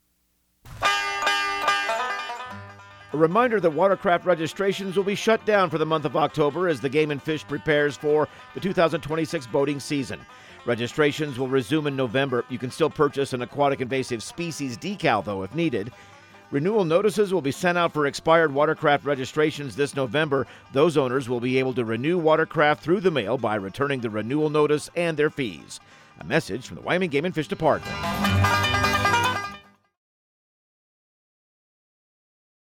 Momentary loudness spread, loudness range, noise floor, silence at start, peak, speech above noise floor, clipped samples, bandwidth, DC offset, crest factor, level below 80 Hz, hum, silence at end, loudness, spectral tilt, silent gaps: 10 LU; 4 LU; -69 dBFS; 0.65 s; -6 dBFS; 45 dB; under 0.1%; 17 kHz; under 0.1%; 18 dB; -54 dBFS; none; 3.2 s; -24 LUFS; -5 dB/octave; none